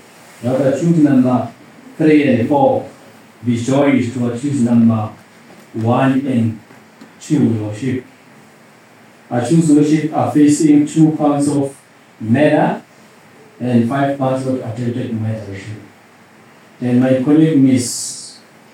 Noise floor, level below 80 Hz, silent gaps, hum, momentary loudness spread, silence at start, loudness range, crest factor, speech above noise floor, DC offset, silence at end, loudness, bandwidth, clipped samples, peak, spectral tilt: -45 dBFS; -66 dBFS; none; none; 14 LU; 0.4 s; 6 LU; 14 dB; 31 dB; under 0.1%; 0.4 s; -15 LUFS; 14 kHz; under 0.1%; 0 dBFS; -6.5 dB/octave